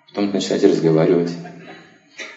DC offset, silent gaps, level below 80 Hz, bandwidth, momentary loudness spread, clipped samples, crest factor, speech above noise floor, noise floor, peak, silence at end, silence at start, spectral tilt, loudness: under 0.1%; none; -70 dBFS; 8 kHz; 20 LU; under 0.1%; 18 dB; 26 dB; -43 dBFS; 0 dBFS; 0 s; 0.15 s; -6.5 dB/octave; -17 LUFS